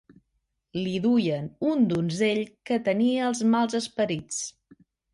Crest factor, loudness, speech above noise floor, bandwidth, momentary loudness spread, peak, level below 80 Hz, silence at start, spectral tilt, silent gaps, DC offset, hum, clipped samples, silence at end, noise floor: 14 dB; -26 LUFS; 52 dB; 11.5 kHz; 9 LU; -12 dBFS; -64 dBFS; 0.75 s; -5 dB/octave; none; under 0.1%; none; under 0.1%; 0.65 s; -77 dBFS